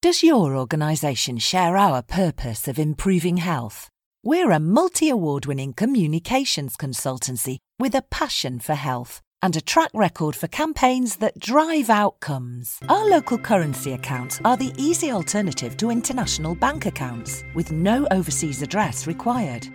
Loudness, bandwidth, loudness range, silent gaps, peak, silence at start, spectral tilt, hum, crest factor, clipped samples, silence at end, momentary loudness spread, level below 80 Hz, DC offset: -22 LUFS; 19 kHz; 3 LU; 4.06-4.12 s, 9.27-9.32 s; -4 dBFS; 0.05 s; -4.5 dB/octave; none; 18 dB; under 0.1%; 0 s; 10 LU; -44 dBFS; under 0.1%